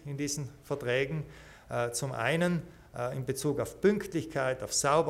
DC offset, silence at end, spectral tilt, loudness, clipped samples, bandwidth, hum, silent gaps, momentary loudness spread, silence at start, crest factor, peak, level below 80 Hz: under 0.1%; 0 s; -4.5 dB/octave; -32 LUFS; under 0.1%; 16 kHz; none; none; 10 LU; 0 s; 18 dB; -14 dBFS; -58 dBFS